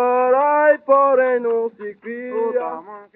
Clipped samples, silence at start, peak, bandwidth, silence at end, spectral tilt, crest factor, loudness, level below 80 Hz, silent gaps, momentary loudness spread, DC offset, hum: under 0.1%; 0 s; -2 dBFS; 3.8 kHz; 0.1 s; -3.5 dB/octave; 14 dB; -17 LUFS; -80 dBFS; none; 16 LU; under 0.1%; none